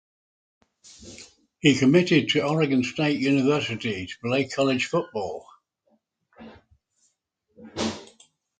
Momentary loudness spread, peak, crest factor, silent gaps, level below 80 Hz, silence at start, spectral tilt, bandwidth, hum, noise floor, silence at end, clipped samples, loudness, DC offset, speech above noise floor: 21 LU; -6 dBFS; 20 dB; none; -60 dBFS; 1 s; -5.5 dB/octave; 9.2 kHz; none; -73 dBFS; 0.55 s; under 0.1%; -23 LUFS; under 0.1%; 51 dB